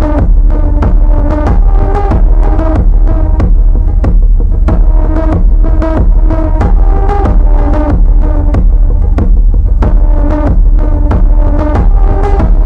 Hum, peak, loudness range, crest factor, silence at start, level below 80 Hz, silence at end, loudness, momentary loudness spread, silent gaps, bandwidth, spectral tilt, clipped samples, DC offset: none; 0 dBFS; 0 LU; 6 dB; 0 s; -6 dBFS; 0 s; -11 LUFS; 1 LU; none; 2.8 kHz; -10 dB/octave; 6%; under 0.1%